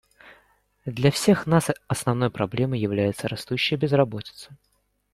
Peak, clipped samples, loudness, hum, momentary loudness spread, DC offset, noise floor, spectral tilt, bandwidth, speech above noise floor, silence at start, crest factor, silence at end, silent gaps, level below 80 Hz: -4 dBFS; under 0.1%; -23 LUFS; none; 15 LU; under 0.1%; -62 dBFS; -5.5 dB/octave; 15.5 kHz; 39 dB; 0.25 s; 20 dB; 0.6 s; none; -56 dBFS